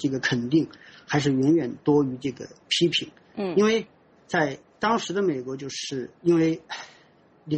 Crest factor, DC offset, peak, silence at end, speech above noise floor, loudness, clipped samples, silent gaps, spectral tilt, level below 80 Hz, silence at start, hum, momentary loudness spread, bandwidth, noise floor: 16 dB; under 0.1%; -8 dBFS; 0 s; 32 dB; -25 LUFS; under 0.1%; none; -5 dB/octave; -64 dBFS; 0 s; none; 12 LU; 8.4 kHz; -57 dBFS